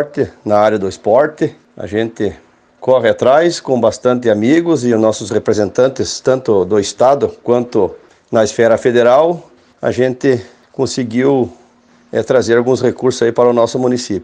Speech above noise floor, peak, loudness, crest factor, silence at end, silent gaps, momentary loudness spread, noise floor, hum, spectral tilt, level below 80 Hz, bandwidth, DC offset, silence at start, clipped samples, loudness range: 36 dB; 0 dBFS; -14 LUFS; 14 dB; 0 s; none; 10 LU; -48 dBFS; none; -5.5 dB/octave; -52 dBFS; 9.8 kHz; under 0.1%; 0 s; under 0.1%; 2 LU